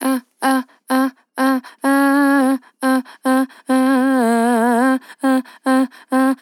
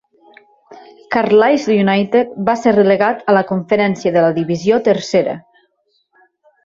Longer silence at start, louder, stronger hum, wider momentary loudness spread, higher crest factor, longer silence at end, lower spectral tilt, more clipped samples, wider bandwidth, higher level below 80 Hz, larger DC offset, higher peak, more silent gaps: second, 0 s vs 0.7 s; second, -17 LUFS vs -14 LUFS; neither; about the same, 6 LU vs 6 LU; about the same, 12 dB vs 14 dB; second, 0.05 s vs 1.25 s; second, -4 dB/octave vs -6.5 dB/octave; neither; first, 17 kHz vs 7.6 kHz; second, under -90 dBFS vs -56 dBFS; neither; about the same, -4 dBFS vs -2 dBFS; neither